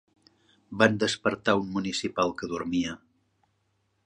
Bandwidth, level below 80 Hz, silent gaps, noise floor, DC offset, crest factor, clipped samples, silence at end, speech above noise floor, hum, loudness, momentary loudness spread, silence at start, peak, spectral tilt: 10.5 kHz; -60 dBFS; none; -73 dBFS; under 0.1%; 26 dB; under 0.1%; 1.1 s; 46 dB; none; -27 LUFS; 11 LU; 0.7 s; -4 dBFS; -4.5 dB/octave